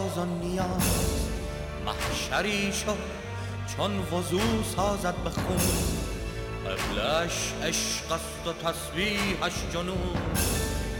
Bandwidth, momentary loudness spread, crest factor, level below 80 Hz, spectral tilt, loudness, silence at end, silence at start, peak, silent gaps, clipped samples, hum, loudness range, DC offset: 17.5 kHz; 8 LU; 18 dB; -38 dBFS; -4 dB/octave; -29 LUFS; 0 s; 0 s; -12 dBFS; none; under 0.1%; none; 1 LU; under 0.1%